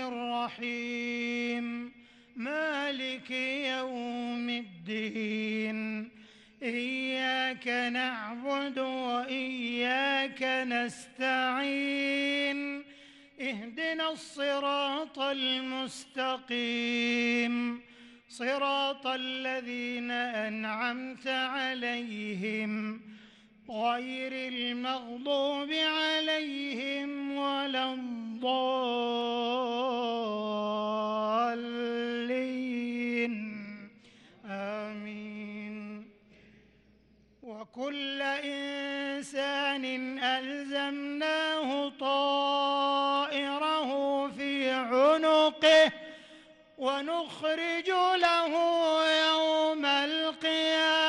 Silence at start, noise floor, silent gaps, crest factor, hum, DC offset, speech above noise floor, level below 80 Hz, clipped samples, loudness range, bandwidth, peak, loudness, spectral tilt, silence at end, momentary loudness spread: 0 s; -63 dBFS; none; 18 dB; none; under 0.1%; 32 dB; -76 dBFS; under 0.1%; 8 LU; 11.5 kHz; -14 dBFS; -30 LUFS; -3.5 dB/octave; 0 s; 11 LU